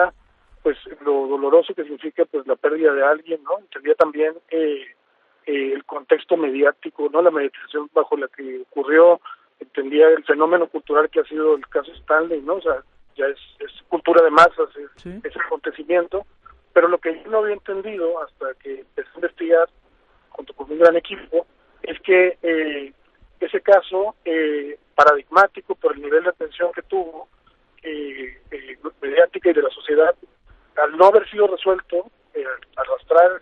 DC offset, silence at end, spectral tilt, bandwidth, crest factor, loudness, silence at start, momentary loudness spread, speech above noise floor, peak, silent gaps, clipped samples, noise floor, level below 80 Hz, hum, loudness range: under 0.1%; 0.05 s; -5 dB/octave; 8 kHz; 20 dB; -19 LUFS; 0 s; 17 LU; 42 dB; 0 dBFS; none; under 0.1%; -61 dBFS; -58 dBFS; none; 5 LU